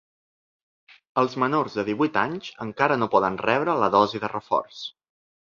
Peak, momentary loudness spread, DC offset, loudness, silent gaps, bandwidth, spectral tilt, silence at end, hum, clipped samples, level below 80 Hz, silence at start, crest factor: -4 dBFS; 13 LU; under 0.1%; -23 LUFS; none; 7.2 kHz; -6 dB/octave; 0.6 s; none; under 0.1%; -64 dBFS; 1.15 s; 22 dB